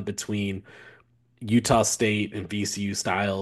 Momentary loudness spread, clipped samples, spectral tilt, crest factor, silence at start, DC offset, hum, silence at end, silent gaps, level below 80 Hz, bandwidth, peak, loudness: 10 LU; under 0.1%; -4 dB/octave; 20 dB; 0 s; under 0.1%; none; 0 s; none; -54 dBFS; 12.5 kHz; -6 dBFS; -25 LUFS